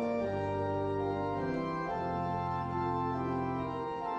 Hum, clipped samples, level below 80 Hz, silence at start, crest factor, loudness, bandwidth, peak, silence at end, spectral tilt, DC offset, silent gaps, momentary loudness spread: none; under 0.1%; -56 dBFS; 0 s; 12 dB; -34 LUFS; 9.2 kHz; -22 dBFS; 0 s; -8.5 dB/octave; under 0.1%; none; 2 LU